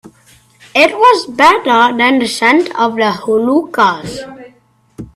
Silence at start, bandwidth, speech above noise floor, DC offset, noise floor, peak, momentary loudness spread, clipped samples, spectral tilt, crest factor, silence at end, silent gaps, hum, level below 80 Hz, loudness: 0.75 s; 14 kHz; 39 dB; under 0.1%; -50 dBFS; 0 dBFS; 10 LU; under 0.1%; -3.5 dB/octave; 12 dB; 0.1 s; none; none; -50 dBFS; -11 LUFS